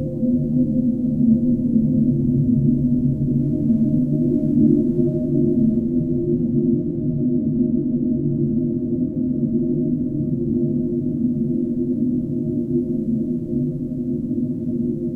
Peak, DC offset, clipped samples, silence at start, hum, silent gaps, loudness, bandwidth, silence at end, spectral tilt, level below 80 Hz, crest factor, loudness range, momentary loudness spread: -4 dBFS; under 0.1%; under 0.1%; 0 s; none; none; -20 LUFS; 1 kHz; 0 s; -13.5 dB/octave; -40 dBFS; 14 dB; 4 LU; 6 LU